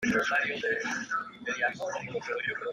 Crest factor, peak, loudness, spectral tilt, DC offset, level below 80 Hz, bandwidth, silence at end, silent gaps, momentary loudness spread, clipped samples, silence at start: 16 dB; -16 dBFS; -31 LUFS; -3.5 dB/octave; under 0.1%; -66 dBFS; 14 kHz; 0 s; none; 8 LU; under 0.1%; 0 s